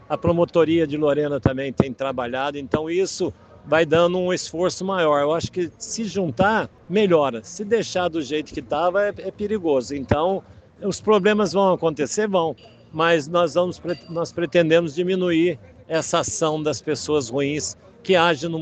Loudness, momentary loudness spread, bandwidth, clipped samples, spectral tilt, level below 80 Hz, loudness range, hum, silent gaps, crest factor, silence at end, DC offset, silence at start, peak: -22 LUFS; 9 LU; 9.2 kHz; under 0.1%; -5 dB/octave; -50 dBFS; 2 LU; none; none; 20 dB; 0 s; under 0.1%; 0.1 s; 0 dBFS